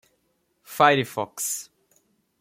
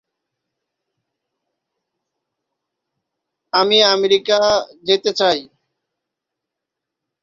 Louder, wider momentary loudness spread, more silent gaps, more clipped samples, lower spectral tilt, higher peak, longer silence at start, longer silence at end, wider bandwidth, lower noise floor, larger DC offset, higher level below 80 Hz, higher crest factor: second, -23 LUFS vs -15 LUFS; first, 13 LU vs 8 LU; neither; neither; about the same, -3 dB/octave vs -2.5 dB/octave; about the same, -4 dBFS vs -2 dBFS; second, 0.7 s vs 3.55 s; second, 0.8 s vs 1.8 s; first, 16.5 kHz vs 7.4 kHz; second, -71 dBFS vs -82 dBFS; neither; second, -72 dBFS vs -62 dBFS; about the same, 22 dB vs 20 dB